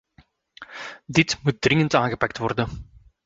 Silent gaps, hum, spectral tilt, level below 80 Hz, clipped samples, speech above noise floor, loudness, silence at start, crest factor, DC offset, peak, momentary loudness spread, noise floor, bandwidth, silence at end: none; none; -5 dB/octave; -48 dBFS; under 0.1%; 36 dB; -22 LUFS; 0.6 s; 24 dB; under 0.1%; 0 dBFS; 17 LU; -58 dBFS; 8 kHz; 0.4 s